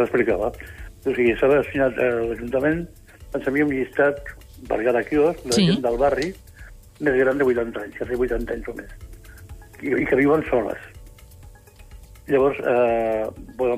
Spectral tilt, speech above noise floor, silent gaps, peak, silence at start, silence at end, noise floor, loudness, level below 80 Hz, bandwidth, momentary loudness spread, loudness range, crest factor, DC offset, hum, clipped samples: -6 dB/octave; 24 dB; none; -8 dBFS; 0 s; 0 s; -45 dBFS; -22 LUFS; -42 dBFS; 15.5 kHz; 14 LU; 3 LU; 14 dB; under 0.1%; none; under 0.1%